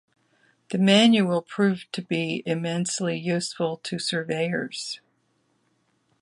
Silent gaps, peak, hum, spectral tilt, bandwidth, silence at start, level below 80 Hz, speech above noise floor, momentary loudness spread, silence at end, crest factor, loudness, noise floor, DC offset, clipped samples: none; -4 dBFS; none; -4.5 dB/octave; 11.5 kHz; 0.7 s; -72 dBFS; 45 dB; 14 LU; 1.25 s; 20 dB; -24 LUFS; -69 dBFS; under 0.1%; under 0.1%